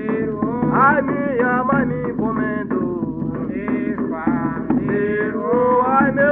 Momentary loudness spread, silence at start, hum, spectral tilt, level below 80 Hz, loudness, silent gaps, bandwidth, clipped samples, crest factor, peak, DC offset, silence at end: 8 LU; 0 s; none; -11.5 dB/octave; -46 dBFS; -19 LUFS; none; 3.7 kHz; under 0.1%; 16 dB; -4 dBFS; under 0.1%; 0 s